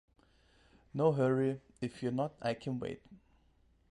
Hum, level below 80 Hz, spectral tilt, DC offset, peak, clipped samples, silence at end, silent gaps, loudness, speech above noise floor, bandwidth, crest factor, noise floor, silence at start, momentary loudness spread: none; -68 dBFS; -8 dB/octave; under 0.1%; -18 dBFS; under 0.1%; 0.75 s; none; -35 LUFS; 35 dB; 11 kHz; 20 dB; -69 dBFS; 0.95 s; 13 LU